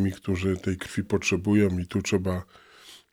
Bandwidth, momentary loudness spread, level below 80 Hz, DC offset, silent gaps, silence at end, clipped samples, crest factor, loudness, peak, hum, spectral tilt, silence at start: 16 kHz; 8 LU; -52 dBFS; under 0.1%; none; 0.15 s; under 0.1%; 16 dB; -26 LUFS; -10 dBFS; none; -6 dB/octave; 0 s